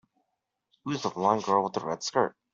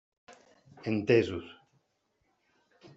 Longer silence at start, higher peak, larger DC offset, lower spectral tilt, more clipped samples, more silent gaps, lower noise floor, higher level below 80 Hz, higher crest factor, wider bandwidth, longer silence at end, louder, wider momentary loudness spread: first, 0.85 s vs 0.3 s; first, -8 dBFS vs -12 dBFS; neither; second, -4.5 dB/octave vs -6 dB/octave; neither; neither; first, -82 dBFS vs -77 dBFS; about the same, -72 dBFS vs -72 dBFS; about the same, 22 dB vs 24 dB; about the same, 7.6 kHz vs 7.8 kHz; second, 0.25 s vs 1.45 s; about the same, -28 LUFS vs -30 LUFS; second, 8 LU vs 17 LU